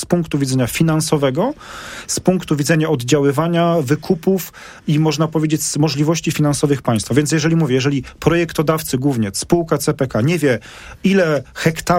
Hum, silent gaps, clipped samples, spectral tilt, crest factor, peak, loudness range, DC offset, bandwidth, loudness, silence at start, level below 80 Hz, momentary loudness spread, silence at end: none; none; under 0.1%; -5.5 dB/octave; 16 dB; 0 dBFS; 1 LU; under 0.1%; 16.5 kHz; -17 LUFS; 0 s; -44 dBFS; 5 LU; 0 s